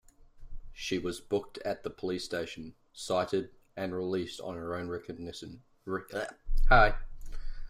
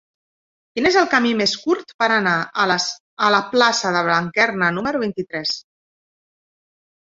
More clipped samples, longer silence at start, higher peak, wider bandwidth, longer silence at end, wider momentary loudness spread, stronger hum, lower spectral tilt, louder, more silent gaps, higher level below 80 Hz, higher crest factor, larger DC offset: neither; second, 0.35 s vs 0.75 s; second, -8 dBFS vs -2 dBFS; first, 11.5 kHz vs 7.8 kHz; second, 0 s vs 1.5 s; first, 19 LU vs 8 LU; neither; first, -5 dB/octave vs -3.5 dB/octave; second, -33 LUFS vs -18 LUFS; second, none vs 1.94-1.99 s, 3.00-3.17 s; first, -36 dBFS vs -60 dBFS; about the same, 22 dB vs 18 dB; neither